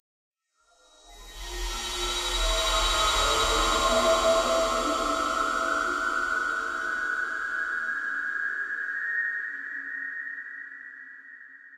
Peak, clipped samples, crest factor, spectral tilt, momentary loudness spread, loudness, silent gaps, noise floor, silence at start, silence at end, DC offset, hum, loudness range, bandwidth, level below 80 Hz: -12 dBFS; under 0.1%; 16 dB; -1.5 dB/octave; 17 LU; -26 LUFS; none; -66 dBFS; 1.05 s; 0 s; under 0.1%; none; 7 LU; 16 kHz; -40 dBFS